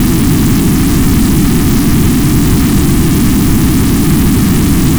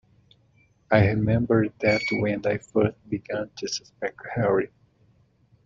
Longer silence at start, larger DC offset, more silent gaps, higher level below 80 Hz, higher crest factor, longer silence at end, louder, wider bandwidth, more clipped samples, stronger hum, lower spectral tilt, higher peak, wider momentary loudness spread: second, 0 s vs 0.9 s; neither; neither; first, -16 dBFS vs -52 dBFS; second, 8 dB vs 22 dB; second, 0 s vs 1 s; first, -9 LUFS vs -25 LUFS; first, over 20 kHz vs 7.6 kHz; neither; neither; about the same, -5.5 dB/octave vs -6 dB/octave; first, 0 dBFS vs -4 dBFS; second, 0 LU vs 11 LU